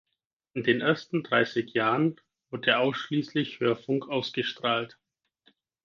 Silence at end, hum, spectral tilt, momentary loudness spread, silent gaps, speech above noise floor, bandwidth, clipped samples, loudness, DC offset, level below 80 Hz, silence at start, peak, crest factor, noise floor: 1 s; none; -6 dB/octave; 6 LU; none; 40 dB; 7.2 kHz; under 0.1%; -27 LUFS; under 0.1%; -74 dBFS; 0.55 s; -8 dBFS; 20 dB; -67 dBFS